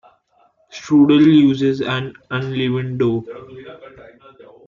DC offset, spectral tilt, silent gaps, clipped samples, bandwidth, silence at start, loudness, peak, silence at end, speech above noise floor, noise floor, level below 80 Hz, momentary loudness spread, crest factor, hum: under 0.1%; -7.5 dB/octave; none; under 0.1%; 7.2 kHz; 0.75 s; -16 LUFS; -4 dBFS; 0.65 s; 42 dB; -58 dBFS; -58 dBFS; 26 LU; 14 dB; none